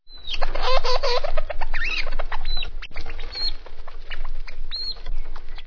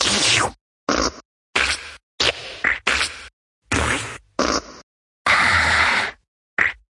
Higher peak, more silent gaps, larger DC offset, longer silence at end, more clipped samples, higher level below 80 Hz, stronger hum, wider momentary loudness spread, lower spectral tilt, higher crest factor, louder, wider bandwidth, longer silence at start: about the same, -4 dBFS vs -2 dBFS; second, none vs 0.61-0.87 s, 1.25-1.53 s, 2.03-2.18 s, 3.33-3.62 s, 4.83-5.25 s, 6.28-6.57 s; neither; second, 0 s vs 0.25 s; neither; first, -24 dBFS vs -42 dBFS; neither; first, 15 LU vs 12 LU; first, -3.5 dB/octave vs -2 dB/octave; second, 14 dB vs 20 dB; second, -28 LUFS vs -19 LUFS; second, 5.4 kHz vs 11.5 kHz; about the same, 0.05 s vs 0 s